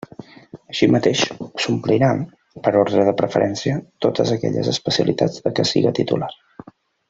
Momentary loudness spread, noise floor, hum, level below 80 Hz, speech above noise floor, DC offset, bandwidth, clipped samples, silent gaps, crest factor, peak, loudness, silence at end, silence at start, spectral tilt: 8 LU; -43 dBFS; none; -56 dBFS; 25 dB; under 0.1%; 8 kHz; under 0.1%; none; 18 dB; -2 dBFS; -19 LUFS; 0.75 s; 0.2 s; -5.5 dB/octave